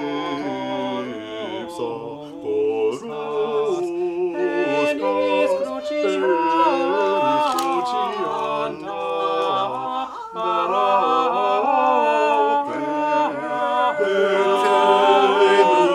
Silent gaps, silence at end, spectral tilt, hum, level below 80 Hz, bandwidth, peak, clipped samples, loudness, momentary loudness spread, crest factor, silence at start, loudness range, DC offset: none; 0 s; -4.5 dB/octave; none; -66 dBFS; 15 kHz; -2 dBFS; under 0.1%; -20 LUFS; 12 LU; 16 dB; 0 s; 6 LU; under 0.1%